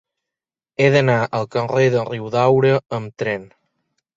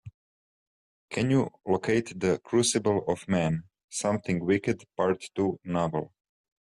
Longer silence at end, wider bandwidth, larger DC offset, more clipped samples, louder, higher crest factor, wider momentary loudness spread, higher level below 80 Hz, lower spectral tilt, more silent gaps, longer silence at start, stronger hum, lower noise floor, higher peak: first, 0.7 s vs 0.55 s; second, 7.6 kHz vs 12.5 kHz; neither; neither; first, -18 LUFS vs -28 LUFS; about the same, 18 dB vs 16 dB; first, 10 LU vs 7 LU; about the same, -58 dBFS vs -62 dBFS; first, -7 dB/octave vs -5 dB/octave; second, none vs 0.14-1.08 s, 3.84-3.88 s; first, 0.8 s vs 0.05 s; neither; about the same, -88 dBFS vs under -90 dBFS; first, -2 dBFS vs -12 dBFS